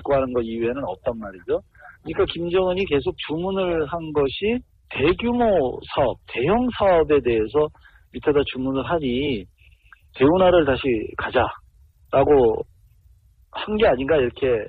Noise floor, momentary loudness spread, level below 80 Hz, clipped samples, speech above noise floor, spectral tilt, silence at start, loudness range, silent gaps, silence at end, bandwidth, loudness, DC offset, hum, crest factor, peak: -54 dBFS; 11 LU; -42 dBFS; under 0.1%; 34 dB; -9 dB/octave; 0 s; 4 LU; none; 0 s; 4.7 kHz; -21 LUFS; under 0.1%; none; 16 dB; -4 dBFS